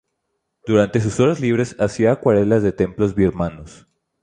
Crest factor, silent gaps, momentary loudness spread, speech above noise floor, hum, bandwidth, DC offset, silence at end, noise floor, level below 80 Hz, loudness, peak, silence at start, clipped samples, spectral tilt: 16 dB; none; 6 LU; 57 dB; none; 10 kHz; under 0.1%; 0.55 s; -74 dBFS; -42 dBFS; -18 LUFS; -2 dBFS; 0.65 s; under 0.1%; -7 dB/octave